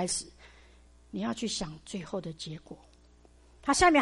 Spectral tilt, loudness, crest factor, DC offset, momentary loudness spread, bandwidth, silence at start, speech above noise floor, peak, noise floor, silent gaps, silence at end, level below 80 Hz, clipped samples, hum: -3 dB/octave; -32 LUFS; 20 dB; under 0.1%; 21 LU; 11.5 kHz; 0 s; 29 dB; -12 dBFS; -59 dBFS; none; 0 s; -52 dBFS; under 0.1%; none